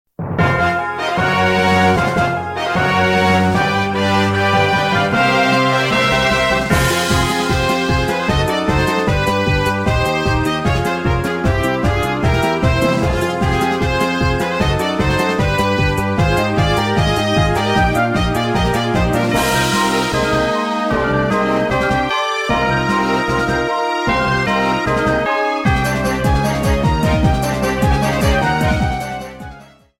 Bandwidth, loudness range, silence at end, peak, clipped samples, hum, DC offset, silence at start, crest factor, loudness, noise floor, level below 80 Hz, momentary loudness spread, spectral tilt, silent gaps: 16.5 kHz; 2 LU; 0.35 s; 0 dBFS; under 0.1%; none; under 0.1%; 0.2 s; 14 dB; -16 LUFS; -39 dBFS; -28 dBFS; 4 LU; -5.5 dB/octave; none